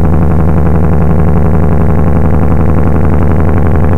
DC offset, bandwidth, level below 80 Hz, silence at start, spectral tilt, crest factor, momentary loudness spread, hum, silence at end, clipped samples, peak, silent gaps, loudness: 30%; 3.2 kHz; -12 dBFS; 0 s; -10.5 dB/octave; 10 dB; 1 LU; none; 0 s; under 0.1%; 0 dBFS; none; -10 LUFS